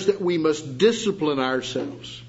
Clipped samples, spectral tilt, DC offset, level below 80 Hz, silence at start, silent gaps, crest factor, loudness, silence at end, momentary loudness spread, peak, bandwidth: under 0.1%; -5 dB/octave; under 0.1%; -60 dBFS; 0 s; none; 18 dB; -23 LUFS; 0 s; 9 LU; -6 dBFS; 8 kHz